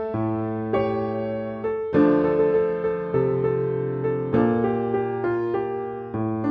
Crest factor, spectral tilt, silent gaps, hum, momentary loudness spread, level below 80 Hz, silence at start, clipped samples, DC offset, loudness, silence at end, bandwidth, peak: 16 dB; -10.5 dB/octave; none; none; 8 LU; -54 dBFS; 0 s; under 0.1%; under 0.1%; -24 LUFS; 0 s; 5.2 kHz; -8 dBFS